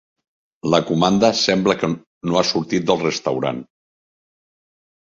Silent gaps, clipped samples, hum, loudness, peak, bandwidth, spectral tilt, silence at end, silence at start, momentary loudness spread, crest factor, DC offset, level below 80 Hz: 2.07-2.21 s; under 0.1%; none; -19 LUFS; -2 dBFS; 7.8 kHz; -5 dB/octave; 1.4 s; 0.65 s; 10 LU; 20 dB; under 0.1%; -56 dBFS